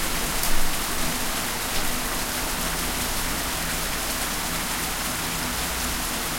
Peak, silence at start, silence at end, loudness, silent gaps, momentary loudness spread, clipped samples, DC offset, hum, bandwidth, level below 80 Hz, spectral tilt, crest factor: -8 dBFS; 0 s; 0 s; -25 LUFS; none; 1 LU; under 0.1%; under 0.1%; none; 16.5 kHz; -32 dBFS; -2 dB/octave; 18 dB